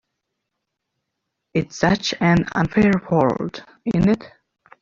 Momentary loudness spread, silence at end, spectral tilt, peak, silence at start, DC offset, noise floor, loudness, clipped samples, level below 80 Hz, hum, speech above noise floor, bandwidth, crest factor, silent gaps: 9 LU; 0.55 s; -6.5 dB/octave; -4 dBFS; 1.55 s; under 0.1%; -79 dBFS; -20 LUFS; under 0.1%; -46 dBFS; none; 60 dB; 7.4 kHz; 18 dB; none